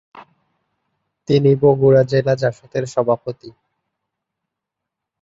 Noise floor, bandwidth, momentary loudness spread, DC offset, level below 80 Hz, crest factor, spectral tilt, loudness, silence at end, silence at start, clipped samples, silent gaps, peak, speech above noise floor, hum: -82 dBFS; 7.8 kHz; 16 LU; under 0.1%; -54 dBFS; 18 dB; -7.5 dB/octave; -16 LUFS; 1.7 s; 0.15 s; under 0.1%; none; -2 dBFS; 66 dB; none